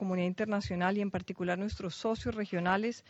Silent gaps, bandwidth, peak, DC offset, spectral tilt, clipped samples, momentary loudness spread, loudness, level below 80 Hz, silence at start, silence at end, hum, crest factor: none; 8 kHz; -14 dBFS; under 0.1%; -6.5 dB/octave; under 0.1%; 5 LU; -34 LUFS; -56 dBFS; 0 s; 0.1 s; none; 18 dB